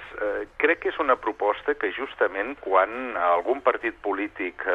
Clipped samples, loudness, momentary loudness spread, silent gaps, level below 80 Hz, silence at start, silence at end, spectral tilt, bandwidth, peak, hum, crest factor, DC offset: under 0.1%; -25 LUFS; 7 LU; none; -58 dBFS; 0 s; 0 s; -5.5 dB/octave; 6.6 kHz; -6 dBFS; none; 20 dB; under 0.1%